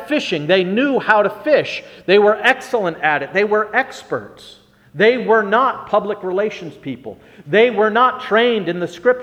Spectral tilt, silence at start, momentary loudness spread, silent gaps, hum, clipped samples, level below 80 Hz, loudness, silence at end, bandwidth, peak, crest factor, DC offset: -5.5 dB/octave; 0 s; 13 LU; none; none; under 0.1%; -60 dBFS; -16 LUFS; 0 s; 11.5 kHz; 0 dBFS; 16 dB; under 0.1%